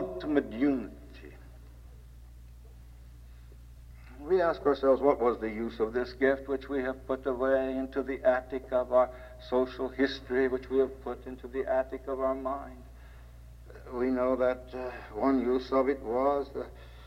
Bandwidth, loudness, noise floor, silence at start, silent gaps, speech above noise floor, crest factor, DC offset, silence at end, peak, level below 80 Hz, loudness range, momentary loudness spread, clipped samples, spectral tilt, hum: 15 kHz; -30 LUFS; -50 dBFS; 0 s; none; 20 dB; 20 dB; under 0.1%; 0 s; -10 dBFS; -50 dBFS; 6 LU; 14 LU; under 0.1%; -7 dB/octave; none